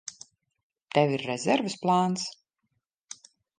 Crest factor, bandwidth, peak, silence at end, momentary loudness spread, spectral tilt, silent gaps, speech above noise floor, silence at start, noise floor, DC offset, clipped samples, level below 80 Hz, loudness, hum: 24 dB; 9.8 kHz; -6 dBFS; 1.25 s; 20 LU; -5 dB/octave; 0.63-0.70 s; 53 dB; 0.05 s; -79 dBFS; under 0.1%; under 0.1%; -76 dBFS; -27 LUFS; none